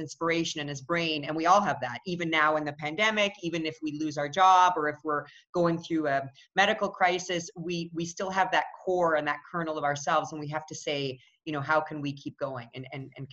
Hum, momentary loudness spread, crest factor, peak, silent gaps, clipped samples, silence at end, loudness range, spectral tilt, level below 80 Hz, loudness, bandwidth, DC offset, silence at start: none; 12 LU; 20 dB; -8 dBFS; 5.49-5.53 s; under 0.1%; 0 s; 5 LU; -4 dB/octave; -68 dBFS; -28 LUFS; 8.2 kHz; under 0.1%; 0 s